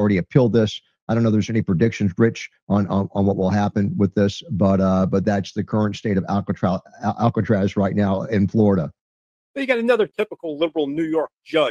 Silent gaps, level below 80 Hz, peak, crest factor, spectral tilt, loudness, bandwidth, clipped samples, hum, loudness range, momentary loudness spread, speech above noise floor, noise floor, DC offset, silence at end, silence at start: 1.02-1.07 s, 2.62-2.67 s, 9.01-9.54 s; -54 dBFS; -2 dBFS; 18 dB; -7.5 dB/octave; -20 LUFS; 7.4 kHz; under 0.1%; none; 1 LU; 7 LU; over 70 dB; under -90 dBFS; under 0.1%; 0 s; 0 s